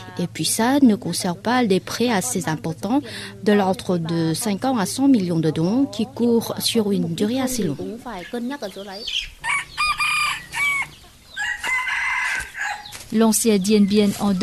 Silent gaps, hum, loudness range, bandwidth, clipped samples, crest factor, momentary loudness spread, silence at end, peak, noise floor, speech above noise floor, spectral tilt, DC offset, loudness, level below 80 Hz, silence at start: none; none; 3 LU; 14.5 kHz; under 0.1%; 16 dB; 12 LU; 0 s; -6 dBFS; -44 dBFS; 24 dB; -4.5 dB/octave; under 0.1%; -21 LUFS; -50 dBFS; 0 s